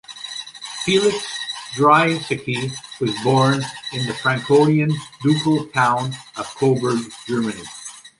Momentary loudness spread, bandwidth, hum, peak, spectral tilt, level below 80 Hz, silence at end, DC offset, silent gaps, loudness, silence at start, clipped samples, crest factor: 15 LU; 11.5 kHz; none; -2 dBFS; -5 dB/octave; -58 dBFS; 0.1 s; under 0.1%; none; -19 LUFS; 0.1 s; under 0.1%; 18 dB